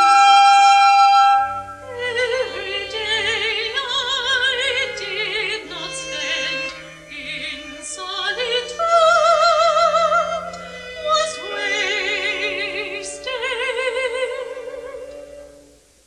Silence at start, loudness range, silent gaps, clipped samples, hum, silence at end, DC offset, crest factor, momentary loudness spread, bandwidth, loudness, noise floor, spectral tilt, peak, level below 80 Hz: 0 s; 8 LU; none; under 0.1%; none; 0.6 s; under 0.1%; 16 dB; 18 LU; 11.5 kHz; -18 LUFS; -49 dBFS; -0.5 dB/octave; -2 dBFS; -54 dBFS